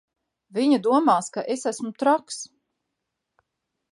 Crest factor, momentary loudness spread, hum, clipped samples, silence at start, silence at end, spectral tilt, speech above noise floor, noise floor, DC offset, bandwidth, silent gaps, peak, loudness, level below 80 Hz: 18 dB; 15 LU; none; under 0.1%; 0.55 s; 1.45 s; -4 dB/octave; 59 dB; -82 dBFS; under 0.1%; 11.5 kHz; none; -6 dBFS; -23 LUFS; -80 dBFS